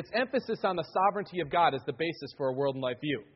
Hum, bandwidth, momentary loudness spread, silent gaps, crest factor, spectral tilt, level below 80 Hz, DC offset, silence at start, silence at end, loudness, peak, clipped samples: none; 5.8 kHz; 8 LU; none; 18 dB; -3.5 dB/octave; -68 dBFS; under 0.1%; 0 s; 0.1 s; -30 LUFS; -12 dBFS; under 0.1%